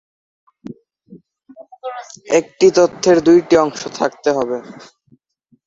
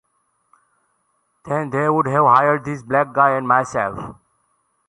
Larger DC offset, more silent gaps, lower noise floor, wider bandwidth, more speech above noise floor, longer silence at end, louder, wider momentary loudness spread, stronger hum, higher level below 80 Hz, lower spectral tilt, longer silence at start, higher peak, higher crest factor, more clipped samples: neither; neither; second, -60 dBFS vs -67 dBFS; second, 7.8 kHz vs 11.5 kHz; second, 45 dB vs 50 dB; first, 0.95 s vs 0.75 s; first, -15 LUFS vs -18 LUFS; first, 21 LU vs 12 LU; neither; about the same, -56 dBFS vs -56 dBFS; second, -4.5 dB/octave vs -7 dB/octave; second, 0.7 s vs 1.45 s; about the same, -2 dBFS vs -2 dBFS; about the same, 16 dB vs 18 dB; neither